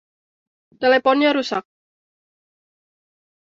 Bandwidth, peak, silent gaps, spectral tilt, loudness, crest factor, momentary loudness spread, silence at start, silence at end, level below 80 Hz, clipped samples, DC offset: 7.6 kHz; -4 dBFS; none; -4 dB/octave; -18 LUFS; 20 dB; 11 LU; 0.8 s; 1.8 s; -68 dBFS; under 0.1%; under 0.1%